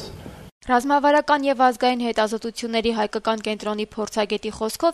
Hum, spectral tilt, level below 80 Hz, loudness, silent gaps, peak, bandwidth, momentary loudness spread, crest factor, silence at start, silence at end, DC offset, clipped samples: none; -4 dB/octave; -52 dBFS; -22 LUFS; 0.52-0.61 s; -4 dBFS; 13.5 kHz; 10 LU; 18 dB; 0 s; 0 s; under 0.1%; under 0.1%